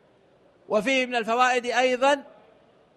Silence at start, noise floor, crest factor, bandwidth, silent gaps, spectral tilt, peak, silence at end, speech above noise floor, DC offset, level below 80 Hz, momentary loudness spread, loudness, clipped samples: 0.7 s; -59 dBFS; 18 dB; 12.5 kHz; none; -3 dB/octave; -8 dBFS; 0.75 s; 36 dB; under 0.1%; -72 dBFS; 5 LU; -23 LUFS; under 0.1%